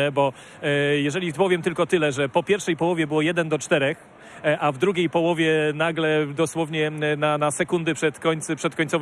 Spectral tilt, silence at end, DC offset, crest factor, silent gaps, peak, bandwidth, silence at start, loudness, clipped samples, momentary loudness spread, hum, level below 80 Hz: -5 dB/octave; 0 s; under 0.1%; 16 dB; none; -6 dBFS; 13 kHz; 0 s; -23 LUFS; under 0.1%; 4 LU; none; -64 dBFS